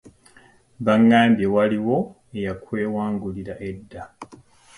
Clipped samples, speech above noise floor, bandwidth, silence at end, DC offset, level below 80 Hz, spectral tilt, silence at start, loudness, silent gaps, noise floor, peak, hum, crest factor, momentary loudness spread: under 0.1%; 33 dB; 11 kHz; 0.45 s; under 0.1%; -52 dBFS; -7.5 dB/octave; 0.05 s; -21 LUFS; none; -53 dBFS; -4 dBFS; none; 18 dB; 20 LU